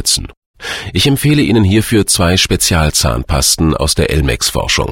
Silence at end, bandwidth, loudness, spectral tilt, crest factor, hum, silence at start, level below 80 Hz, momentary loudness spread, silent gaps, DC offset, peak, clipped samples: 0 s; 16.5 kHz; -12 LUFS; -4 dB/octave; 12 dB; none; 0 s; -24 dBFS; 5 LU; 0.37-0.54 s; under 0.1%; 0 dBFS; under 0.1%